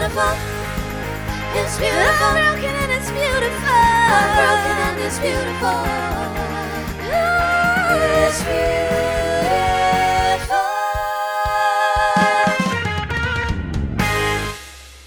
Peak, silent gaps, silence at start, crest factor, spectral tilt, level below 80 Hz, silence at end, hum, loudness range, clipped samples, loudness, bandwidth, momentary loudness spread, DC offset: -2 dBFS; none; 0 s; 16 dB; -4 dB/octave; -32 dBFS; 0 s; none; 3 LU; under 0.1%; -18 LUFS; over 20 kHz; 10 LU; under 0.1%